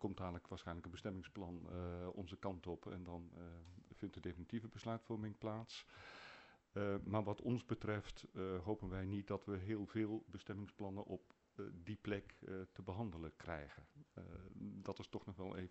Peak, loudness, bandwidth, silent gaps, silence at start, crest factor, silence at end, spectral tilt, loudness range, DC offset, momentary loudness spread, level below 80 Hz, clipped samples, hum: -26 dBFS; -48 LUFS; 8.2 kHz; none; 0 s; 22 dB; 0 s; -7.5 dB/octave; 6 LU; under 0.1%; 13 LU; -66 dBFS; under 0.1%; none